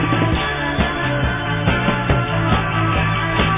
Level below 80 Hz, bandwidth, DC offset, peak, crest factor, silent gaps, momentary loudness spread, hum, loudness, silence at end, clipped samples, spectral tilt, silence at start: -28 dBFS; 3.9 kHz; under 0.1%; -2 dBFS; 14 dB; none; 2 LU; none; -18 LUFS; 0 s; under 0.1%; -10 dB/octave; 0 s